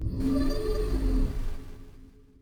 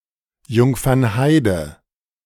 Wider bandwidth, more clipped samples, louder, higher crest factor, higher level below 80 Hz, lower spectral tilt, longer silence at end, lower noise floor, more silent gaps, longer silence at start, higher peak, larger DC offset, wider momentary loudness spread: about the same, 18 kHz vs 17.5 kHz; neither; second, -30 LUFS vs -17 LUFS; about the same, 12 dB vs 16 dB; first, -30 dBFS vs -40 dBFS; about the same, -7.5 dB/octave vs -6.5 dB/octave; second, 0.35 s vs 0.55 s; about the same, -50 dBFS vs -50 dBFS; neither; second, 0 s vs 0.5 s; second, -16 dBFS vs -2 dBFS; neither; first, 18 LU vs 9 LU